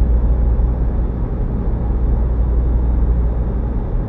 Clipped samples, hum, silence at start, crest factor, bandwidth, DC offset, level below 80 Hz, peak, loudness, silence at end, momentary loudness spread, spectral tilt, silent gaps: under 0.1%; none; 0 s; 10 dB; 2.3 kHz; under 0.1%; -16 dBFS; -4 dBFS; -19 LUFS; 0 s; 4 LU; -12.5 dB/octave; none